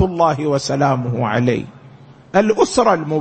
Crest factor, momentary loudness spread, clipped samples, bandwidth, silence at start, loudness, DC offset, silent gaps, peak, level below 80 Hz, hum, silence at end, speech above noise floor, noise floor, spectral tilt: 16 dB; 5 LU; under 0.1%; 8.8 kHz; 0 s; -17 LUFS; under 0.1%; none; -2 dBFS; -46 dBFS; none; 0 s; 26 dB; -42 dBFS; -6 dB/octave